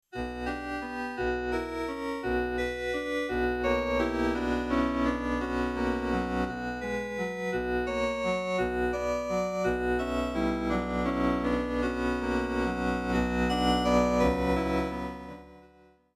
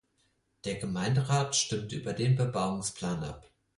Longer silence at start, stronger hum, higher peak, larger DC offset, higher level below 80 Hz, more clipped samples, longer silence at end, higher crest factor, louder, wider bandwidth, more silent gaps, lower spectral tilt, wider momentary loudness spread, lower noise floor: second, 0.15 s vs 0.65 s; neither; about the same, -14 dBFS vs -14 dBFS; neither; first, -42 dBFS vs -58 dBFS; neither; first, 0.5 s vs 0.35 s; about the same, 16 dB vs 16 dB; about the same, -29 LUFS vs -31 LUFS; first, 15 kHz vs 11.5 kHz; neither; first, -6 dB/octave vs -4.5 dB/octave; second, 8 LU vs 11 LU; second, -59 dBFS vs -73 dBFS